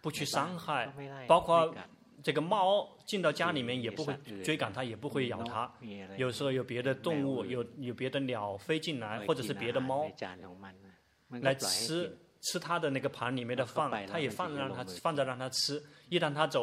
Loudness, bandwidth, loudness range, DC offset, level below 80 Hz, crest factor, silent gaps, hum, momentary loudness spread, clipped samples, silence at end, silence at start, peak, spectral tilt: -34 LUFS; 16 kHz; 5 LU; under 0.1%; -72 dBFS; 24 dB; none; none; 11 LU; under 0.1%; 0 s; 0.05 s; -10 dBFS; -4.5 dB/octave